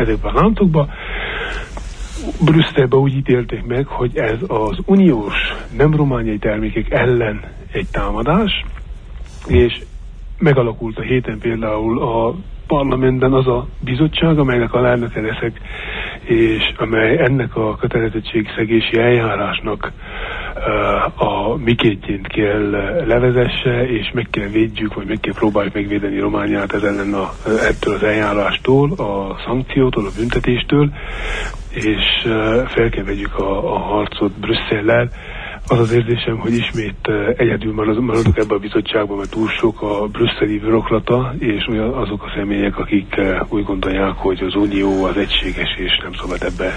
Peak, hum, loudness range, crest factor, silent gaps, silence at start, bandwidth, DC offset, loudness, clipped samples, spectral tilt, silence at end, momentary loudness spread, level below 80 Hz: -2 dBFS; none; 2 LU; 14 dB; none; 0 s; 10 kHz; under 0.1%; -17 LUFS; under 0.1%; -7 dB/octave; 0 s; 9 LU; -30 dBFS